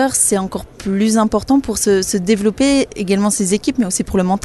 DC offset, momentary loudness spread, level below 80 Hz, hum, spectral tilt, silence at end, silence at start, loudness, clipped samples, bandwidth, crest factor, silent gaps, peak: under 0.1%; 4 LU; -38 dBFS; none; -4 dB/octave; 0.05 s; 0 s; -16 LUFS; under 0.1%; 12.5 kHz; 14 dB; none; -2 dBFS